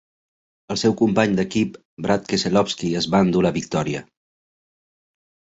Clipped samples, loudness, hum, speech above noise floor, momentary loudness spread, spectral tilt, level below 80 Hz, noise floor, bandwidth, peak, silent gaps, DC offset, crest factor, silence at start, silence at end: under 0.1%; -21 LUFS; none; over 70 dB; 9 LU; -5.5 dB/octave; -52 dBFS; under -90 dBFS; 8 kHz; -4 dBFS; 1.85-1.97 s; under 0.1%; 18 dB; 0.7 s; 1.45 s